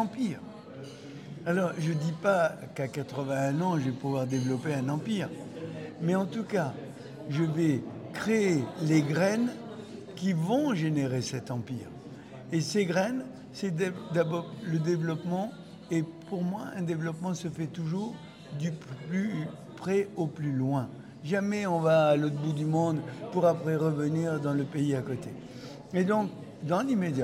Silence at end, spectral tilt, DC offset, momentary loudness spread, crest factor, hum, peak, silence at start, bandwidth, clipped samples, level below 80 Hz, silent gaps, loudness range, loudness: 0 s; -6.5 dB/octave; under 0.1%; 15 LU; 18 dB; none; -12 dBFS; 0 s; 13.5 kHz; under 0.1%; -72 dBFS; none; 6 LU; -30 LUFS